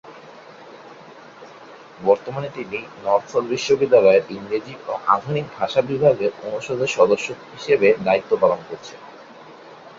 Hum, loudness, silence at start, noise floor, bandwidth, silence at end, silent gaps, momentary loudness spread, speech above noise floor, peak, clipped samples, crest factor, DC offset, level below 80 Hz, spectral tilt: none; -20 LUFS; 0.05 s; -43 dBFS; 7.8 kHz; 0.1 s; none; 14 LU; 23 dB; -2 dBFS; under 0.1%; 20 dB; under 0.1%; -62 dBFS; -5 dB/octave